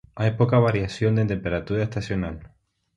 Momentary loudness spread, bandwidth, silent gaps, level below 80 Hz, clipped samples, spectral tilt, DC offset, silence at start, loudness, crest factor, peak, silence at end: 9 LU; 8.2 kHz; none; -44 dBFS; under 0.1%; -8 dB/octave; under 0.1%; 0.15 s; -24 LUFS; 18 dB; -6 dBFS; 0.5 s